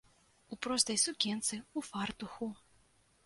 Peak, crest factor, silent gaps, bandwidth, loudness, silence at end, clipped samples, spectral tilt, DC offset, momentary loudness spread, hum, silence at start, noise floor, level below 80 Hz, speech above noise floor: -14 dBFS; 24 dB; none; 12 kHz; -35 LUFS; 0.7 s; under 0.1%; -2 dB/octave; under 0.1%; 13 LU; none; 0.5 s; -69 dBFS; -70 dBFS; 33 dB